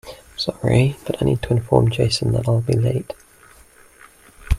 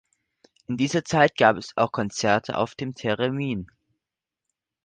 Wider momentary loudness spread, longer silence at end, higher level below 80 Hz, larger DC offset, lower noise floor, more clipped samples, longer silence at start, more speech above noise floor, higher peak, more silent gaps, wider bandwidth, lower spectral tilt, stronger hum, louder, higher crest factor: about the same, 10 LU vs 11 LU; second, 0 s vs 1.2 s; first, -34 dBFS vs -58 dBFS; neither; second, -49 dBFS vs -87 dBFS; neither; second, 0.05 s vs 0.7 s; second, 30 dB vs 64 dB; about the same, 0 dBFS vs -2 dBFS; neither; first, 13.5 kHz vs 9.8 kHz; first, -6.5 dB/octave vs -5 dB/octave; neither; first, -19 LUFS vs -24 LUFS; about the same, 20 dB vs 22 dB